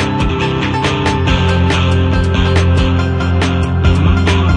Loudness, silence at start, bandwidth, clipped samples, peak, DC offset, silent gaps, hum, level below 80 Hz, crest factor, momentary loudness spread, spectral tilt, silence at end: -13 LUFS; 0 s; 10 kHz; under 0.1%; 0 dBFS; under 0.1%; none; none; -22 dBFS; 12 dB; 3 LU; -6.5 dB/octave; 0 s